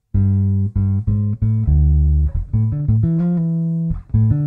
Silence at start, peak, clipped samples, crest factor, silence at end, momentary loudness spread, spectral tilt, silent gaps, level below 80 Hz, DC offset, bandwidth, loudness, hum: 0.15 s; -6 dBFS; under 0.1%; 10 dB; 0 s; 5 LU; -13.5 dB/octave; none; -22 dBFS; under 0.1%; 1.9 kHz; -18 LUFS; none